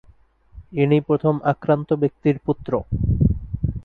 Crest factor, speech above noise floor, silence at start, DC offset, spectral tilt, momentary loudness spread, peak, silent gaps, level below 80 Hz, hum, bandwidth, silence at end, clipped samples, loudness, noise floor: 16 dB; 33 dB; 0.55 s; under 0.1%; -11 dB/octave; 6 LU; -4 dBFS; none; -32 dBFS; none; 4.3 kHz; 0 s; under 0.1%; -21 LUFS; -53 dBFS